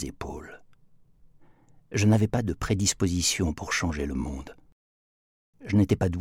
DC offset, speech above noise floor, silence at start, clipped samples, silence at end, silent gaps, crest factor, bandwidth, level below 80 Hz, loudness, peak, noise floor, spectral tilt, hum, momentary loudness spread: under 0.1%; 31 dB; 0 s; under 0.1%; 0 s; 4.72-5.53 s; 20 dB; 15.5 kHz; -44 dBFS; -26 LUFS; -8 dBFS; -56 dBFS; -5 dB/octave; none; 17 LU